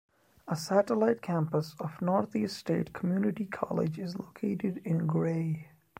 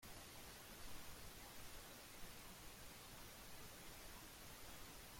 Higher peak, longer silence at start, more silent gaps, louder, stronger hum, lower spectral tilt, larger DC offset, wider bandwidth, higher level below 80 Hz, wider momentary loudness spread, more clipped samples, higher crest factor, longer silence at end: first, -10 dBFS vs -42 dBFS; first, 0.45 s vs 0 s; neither; first, -31 LUFS vs -57 LUFS; neither; first, -7.5 dB/octave vs -2.5 dB/octave; neither; about the same, 16 kHz vs 16.5 kHz; about the same, -68 dBFS vs -66 dBFS; first, 9 LU vs 1 LU; neither; about the same, 20 dB vs 16 dB; first, 0.35 s vs 0 s